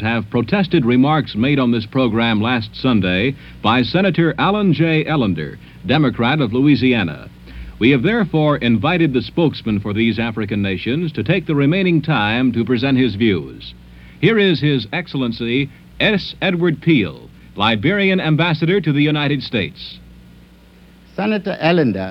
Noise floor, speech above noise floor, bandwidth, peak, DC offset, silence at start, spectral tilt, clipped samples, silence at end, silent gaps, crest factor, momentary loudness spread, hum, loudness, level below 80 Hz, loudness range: -45 dBFS; 29 dB; 6 kHz; 0 dBFS; under 0.1%; 0 s; -8.5 dB/octave; under 0.1%; 0 s; none; 16 dB; 8 LU; none; -17 LUFS; -44 dBFS; 2 LU